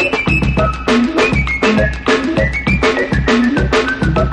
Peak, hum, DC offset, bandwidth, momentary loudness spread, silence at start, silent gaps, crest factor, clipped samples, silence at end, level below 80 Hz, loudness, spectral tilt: -2 dBFS; none; under 0.1%; 10.5 kHz; 2 LU; 0 s; none; 12 dB; under 0.1%; 0 s; -22 dBFS; -14 LUFS; -6 dB/octave